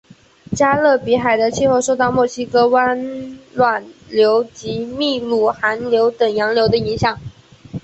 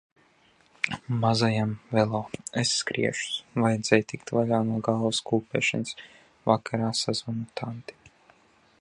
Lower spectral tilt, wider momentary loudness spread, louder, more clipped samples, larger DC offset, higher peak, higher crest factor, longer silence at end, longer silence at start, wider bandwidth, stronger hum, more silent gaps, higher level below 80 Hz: about the same, -4.5 dB/octave vs -4.5 dB/octave; about the same, 11 LU vs 10 LU; first, -16 LUFS vs -27 LUFS; neither; neither; about the same, -2 dBFS vs -4 dBFS; second, 14 dB vs 24 dB; second, 0.05 s vs 0.7 s; second, 0.5 s vs 0.85 s; second, 8.2 kHz vs 11 kHz; neither; neither; first, -48 dBFS vs -62 dBFS